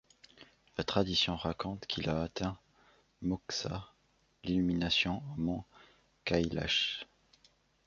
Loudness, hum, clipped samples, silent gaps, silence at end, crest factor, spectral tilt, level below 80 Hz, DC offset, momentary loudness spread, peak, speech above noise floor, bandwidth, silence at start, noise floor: -34 LUFS; none; under 0.1%; none; 0.85 s; 24 dB; -5 dB/octave; -54 dBFS; under 0.1%; 12 LU; -12 dBFS; 38 dB; 7.6 kHz; 0.4 s; -72 dBFS